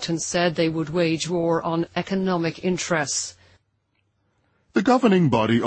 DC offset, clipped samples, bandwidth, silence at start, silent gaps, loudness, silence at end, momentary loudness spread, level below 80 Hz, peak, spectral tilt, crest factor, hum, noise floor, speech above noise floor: under 0.1%; under 0.1%; 8.8 kHz; 0 s; none; -22 LUFS; 0 s; 8 LU; -56 dBFS; -4 dBFS; -5 dB/octave; 18 dB; none; -70 dBFS; 48 dB